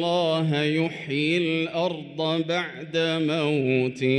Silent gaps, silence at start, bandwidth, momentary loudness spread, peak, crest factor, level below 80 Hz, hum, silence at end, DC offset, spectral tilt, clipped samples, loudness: none; 0 s; 11 kHz; 5 LU; -10 dBFS; 14 dB; -70 dBFS; none; 0 s; under 0.1%; -6.5 dB/octave; under 0.1%; -25 LUFS